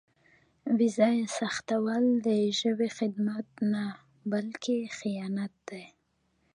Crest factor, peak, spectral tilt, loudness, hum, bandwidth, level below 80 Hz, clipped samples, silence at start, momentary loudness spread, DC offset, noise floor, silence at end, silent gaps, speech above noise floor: 18 dB; -12 dBFS; -5 dB/octave; -29 LUFS; none; 10.5 kHz; -76 dBFS; under 0.1%; 0.65 s; 13 LU; under 0.1%; -73 dBFS; 0.65 s; none; 44 dB